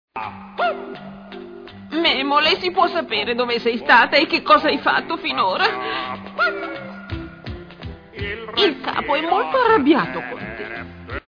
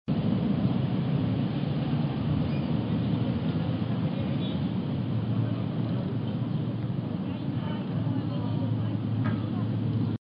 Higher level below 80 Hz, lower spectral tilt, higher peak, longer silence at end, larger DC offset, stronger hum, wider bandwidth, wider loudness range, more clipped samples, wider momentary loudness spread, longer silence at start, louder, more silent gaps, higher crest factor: first, -46 dBFS vs -52 dBFS; second, -5.5 dB/octave vs -11 dB/octave; first, -2 dBFS vs -14 dBFS; about the same, 0.1 s vs 0.05 s; neither; neither; about the same, 5.4 kHz vs 5.2 kHz; first, 7 LU vs 2 LU; neither; first, 20 LU vs 4 LU; about the same, 0.15 s vs 0.05 s; first, -18 LUFS vs -29 LUFS; neither; about the same, 18 dB vs 14 dB